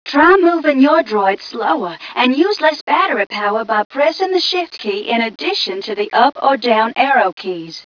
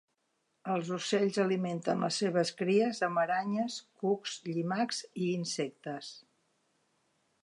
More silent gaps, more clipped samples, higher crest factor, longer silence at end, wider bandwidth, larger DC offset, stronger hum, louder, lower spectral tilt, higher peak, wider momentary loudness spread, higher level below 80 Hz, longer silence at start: first, 2.81-2.87 s, 3.85-3.90 s, 7.33-7.37 s vs none; neither; about the same, 14 dB vs 16 dB; second, 0.05 s vs 1.25 s; second, 5.4 kHz vs 11.5 kHz; neither; neither; first, -15 LUFS vs -32 LUFS; about the same, -4 dB/octave vs -5 dB/octave; first, 0 dBFS vs -16 dBFS; about the same, 8 LU vs 9 LU; first, -58 dBFS vs -84 dBFS; second, 0.05 s vs 0.65 s